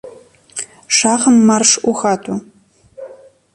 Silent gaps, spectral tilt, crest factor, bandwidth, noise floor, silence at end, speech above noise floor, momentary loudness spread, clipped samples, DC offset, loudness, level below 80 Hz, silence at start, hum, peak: none; -2.5 dB/octave; 16 dB; 11.5 kHz; -42 dBFS; 0.4 s; 30 dB; 18 LU; under 0.1%; under 0.1%; -12 LUFS; -58 dBFS; 0.05 s; none; 0 dBFS